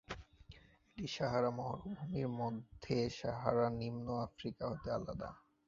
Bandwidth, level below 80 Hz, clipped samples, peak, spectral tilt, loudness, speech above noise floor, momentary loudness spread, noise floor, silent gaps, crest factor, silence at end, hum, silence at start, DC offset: 7.4 kHz; -62 dBFS; under 0.1%; -16 dBFS; -6 dB/octave; -40 LUFS; 22 dB; 13 LU; -61 dBFS; none; 24 dB; 0.3 s; none; 0.1 s; under 0.1%